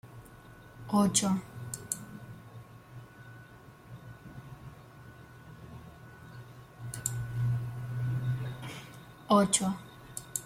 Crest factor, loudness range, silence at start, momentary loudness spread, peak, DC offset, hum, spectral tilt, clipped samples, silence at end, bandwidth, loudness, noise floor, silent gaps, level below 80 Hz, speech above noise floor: 24 dB; 18 LU; 0.05 s; 25 LU; -10 dBFS; under 0.1%; none; -4.5 dB/octave; under 0.1%; 0 s; 16.5 kHz; -31 LUFS; -53 dBFS; none; -60 dBFS; 26 dB